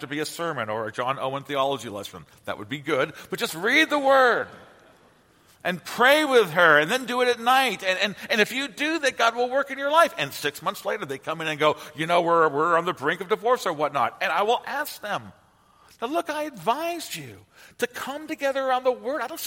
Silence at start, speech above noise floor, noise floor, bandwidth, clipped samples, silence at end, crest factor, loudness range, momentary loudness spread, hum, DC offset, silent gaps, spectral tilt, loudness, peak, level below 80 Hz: 0 s; 34 dB; -58 dBFS; 16.5 kHz; under 0.1%; 0 s; 22 dB; 8 LU; 13 LU; none; under 0.1%; none; -3.5 dB/octave; -23 LUFS; -4 dBFS; -70 dBFS